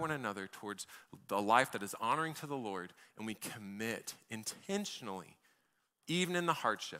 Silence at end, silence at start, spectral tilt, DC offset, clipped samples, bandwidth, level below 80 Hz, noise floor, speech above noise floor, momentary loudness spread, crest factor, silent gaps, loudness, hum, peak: 0 s; 0 s; -3.5 dB/octave; under 0.1%; under 0.1%; 16 kHz; -80 dBFS; -79 dBFS; 41 dB; 16 LU; 24 dB; none; -38 LUFS; none; -14 dBFS